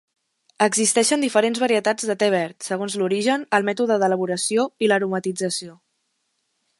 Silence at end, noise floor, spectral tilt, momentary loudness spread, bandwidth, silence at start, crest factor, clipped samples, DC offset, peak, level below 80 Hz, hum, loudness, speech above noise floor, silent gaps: 1.05 s; -72 dBFS; -3 dB/octave; 8 LU; 12 kHz; 0.6 s; 20 dB; under 0.1%; under 0.1%; -2 dBFS; -72 dBFS; none; -21 LUFS; 52 dB; none